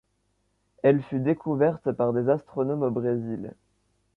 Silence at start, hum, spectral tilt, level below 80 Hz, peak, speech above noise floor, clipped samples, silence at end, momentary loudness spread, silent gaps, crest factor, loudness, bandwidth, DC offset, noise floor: 0.85 s; 50 Hz at -60 dBFS; -10.5 dB/octave; -64 dBFS; -8 dBFS; 47 dB; under 0.1%; 0.65 s; 7 LU; none; 18 dB; -26 LUFS; 4.2 kHz; under 0.1%; -72 dBFS